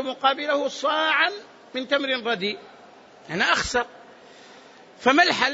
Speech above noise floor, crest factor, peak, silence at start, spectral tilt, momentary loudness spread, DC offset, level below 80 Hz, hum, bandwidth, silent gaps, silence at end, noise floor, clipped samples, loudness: 26 dB; 20 dB; -4 dBFS; 0 s; -2.5 dB/octave; 15 LU; under 0.1%; -56 dBFS; none; 8 kHz; none; 0 s; -49 dBFS; under 0.1%; -22 LUFS